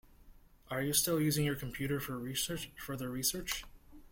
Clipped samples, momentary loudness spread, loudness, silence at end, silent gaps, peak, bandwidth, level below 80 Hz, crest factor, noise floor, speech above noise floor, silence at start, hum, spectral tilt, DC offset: under 0.1%; 11 LU; -35 LUFS; 0.05 s; none; -14 dBFS; 16.5 kHz; -56 dBFS; 24 dB; -59 dBFS; 24 dB; 0.2 s; none; -3.5 dB/octave; under 0.1%